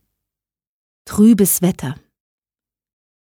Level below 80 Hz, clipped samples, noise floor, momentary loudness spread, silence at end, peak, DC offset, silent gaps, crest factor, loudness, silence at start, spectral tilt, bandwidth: -50 dBFS; under 0.1%; under -90 dBFS; 17 LU; 1.35 s; -2 dBFS; under 0.1%; none; 16 dB; -14 LUFS; 1.05 s; -5.5 dB/octave; 19.5 kHz